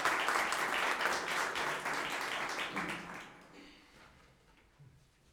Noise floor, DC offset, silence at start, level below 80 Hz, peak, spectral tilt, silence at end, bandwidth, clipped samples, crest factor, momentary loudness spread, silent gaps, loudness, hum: -65 dBFS; under 0.1%; 0 s; -70 dBFS; -16 dBFS; -1.5 dB/octave; 0.5 s; over 20 kHz; under 0.1%; 22 dB; 19 LU; none; -35 LUFS; none